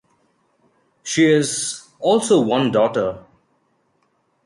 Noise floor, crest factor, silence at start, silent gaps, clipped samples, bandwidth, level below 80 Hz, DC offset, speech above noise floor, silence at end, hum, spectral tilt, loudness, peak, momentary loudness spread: -65 dBFS; 16 dB; 1.05 s; none; under 0.1%; 11.5 kHz; -60 dBFS; under 0.1%; 48 dB; 1.25 s; none; -4.5 dB/octave; -18 LUFS; -4 dBFS; 11 LU